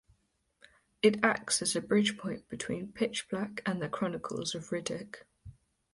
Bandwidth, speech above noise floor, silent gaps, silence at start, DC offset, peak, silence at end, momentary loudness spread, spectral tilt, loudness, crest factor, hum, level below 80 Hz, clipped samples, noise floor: 11.5 kHz; 42 dB; none; 1.05 s; under 0.1%; -10 dBFS; 0.4 s; 12 LU; -3.5 dB/octave; -32 LUFS; 24 dB; none; -66 dBFS; under 0.1%; -74 dBFS